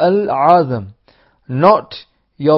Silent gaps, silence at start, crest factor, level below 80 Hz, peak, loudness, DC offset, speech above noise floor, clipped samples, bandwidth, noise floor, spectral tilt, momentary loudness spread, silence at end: none; 0 s; 14 dB; -52 dBFS; 0 dBFS; -14 LUFS; under 0.1%; 41 dB; under 0.1%; 5.8 kHz; -54 dBFS; -9.5 dB/octave; 17 LU; 0 s